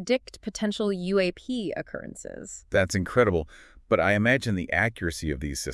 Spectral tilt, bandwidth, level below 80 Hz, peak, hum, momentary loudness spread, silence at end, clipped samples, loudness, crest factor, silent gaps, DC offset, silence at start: -5 dB/octave; 12 kHz; -48 dBFS; -6 dBFS; none; 15 LU; 0 s; under 0.1%; -26 LUFS; 20 dB; none; under 0.1%; 0 s